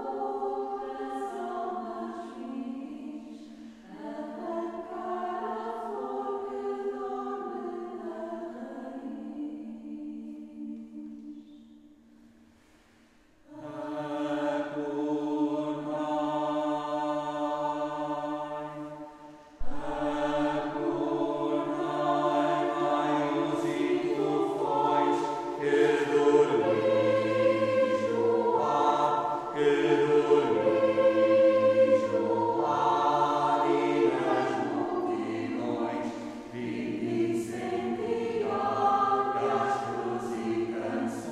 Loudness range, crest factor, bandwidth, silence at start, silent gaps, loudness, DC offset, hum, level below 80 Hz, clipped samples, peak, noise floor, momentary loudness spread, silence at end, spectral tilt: 15 LU; 18 dB; 12 kHz; 0 s; none; -29 LUFS; under 0.1%; none; -58 dBFS; under 0.1%; -10 dBFS; -60 dBFS; 16 LU; 0 s; -6 dB/octave